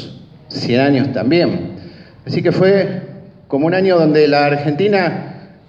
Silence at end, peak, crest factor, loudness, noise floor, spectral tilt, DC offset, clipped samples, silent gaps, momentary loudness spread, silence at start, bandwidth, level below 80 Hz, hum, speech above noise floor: 0.2 s; 0 dBFS; 14 dB; -14 LUFS; -36 dBFS; -8 dB/octave; under 0.1%; under 0.1%; none; 18 LU; 0 s; 7.6 kHz; -58 dBFS; none; 23 dB